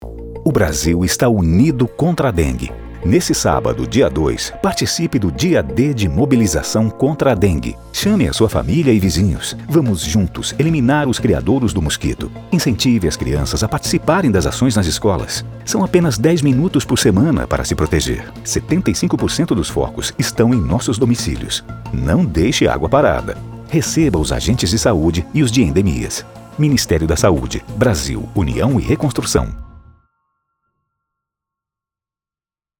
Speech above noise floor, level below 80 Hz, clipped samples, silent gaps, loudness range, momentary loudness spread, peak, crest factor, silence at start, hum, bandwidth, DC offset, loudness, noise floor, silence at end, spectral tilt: over 75 dB; -30 dBFS; under 0.1%; none; 2 LU; 7 LU; -2 dBFS; 14 dB; 0 s; none; over 20 kHz; under 0.1%; -16 LUFS; under -90 dBFS; 3 s; -5.5 dB/octave